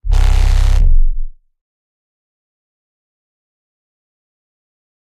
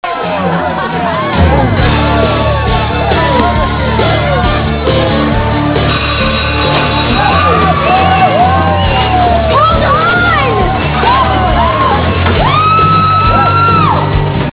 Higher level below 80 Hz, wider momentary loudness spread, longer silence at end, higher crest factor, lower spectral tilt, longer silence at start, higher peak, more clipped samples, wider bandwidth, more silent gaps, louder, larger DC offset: about the same, -16 dBFS vs -18 dBFS; first, 14 LU vs 4 LU; first, 3.7 s vs 0.05 s; about the same, 14 dB vs 10 dB; second, -5 dB/octave vs -10 dB/octave; about the same, 0.05 s vs 0.05 s; about the same, -2 dBFS vs 0 dBFS; second, under 0.1% vs 0.2%; first, 8.4 kHz vs 4 kHz; neither; second, -16 LUFS vs -9 LUFS; second, under 0.1% vs 0.4%